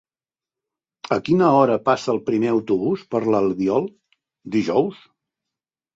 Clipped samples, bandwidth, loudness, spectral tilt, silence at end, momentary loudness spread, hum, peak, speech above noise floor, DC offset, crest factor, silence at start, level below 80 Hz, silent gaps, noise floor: under 0.1%; 7.8 kHz; -20 LUFS; -7 dB/octave; 1 s; 9 LU; none; -2 dBFS; over 71 dB; under 0.1%; 18 dB; 1.05 s; -60 dBFS; none; under -90 dBFS